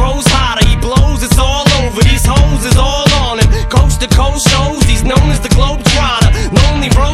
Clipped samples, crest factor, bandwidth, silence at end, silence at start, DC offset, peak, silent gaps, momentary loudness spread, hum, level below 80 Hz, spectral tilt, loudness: 1%; 8 dB; 15 kHz; 0 s; 0 s; under 0.1%; 0 dBFS; none; 2 LU; none; -12 dBFS; -4.5 dB/octave; -10 LUFS